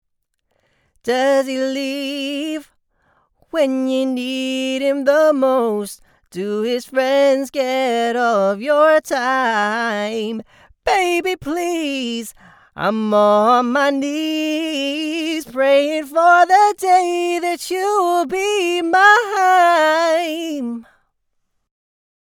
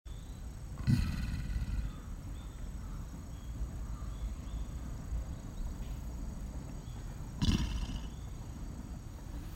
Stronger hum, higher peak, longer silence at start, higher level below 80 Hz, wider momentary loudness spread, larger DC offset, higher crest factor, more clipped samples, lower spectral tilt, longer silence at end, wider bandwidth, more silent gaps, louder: neither; first, 0 dBFS vs -16 dBFS; first, 1.05 s vs 0.05 s; second, -58 dBFS vs -40 dBFS; about the same, 12 LU vs 13 LU; neither; about the same, 18 dB vs 22 dB; neither; second, -3.5 dB/octave vs -6 dB/octave; first, 1.5 s vs 0 s; first, 19.5 kHz vs 16 kHz; neither; first, -17 LUFS vs -41 LUFS